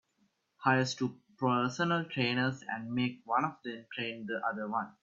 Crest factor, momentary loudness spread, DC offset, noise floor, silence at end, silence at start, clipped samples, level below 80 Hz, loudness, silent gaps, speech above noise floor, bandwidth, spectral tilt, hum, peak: 22 dB; 8 LU; under 0.1%; -75 dBFS; 0.1 s; 0.6 s; under 0.1%; -74 dBFS; -33 LUFS; none; 42 dB; 7.8 kHz; -5.5 dB/octave; none; -12 dBFS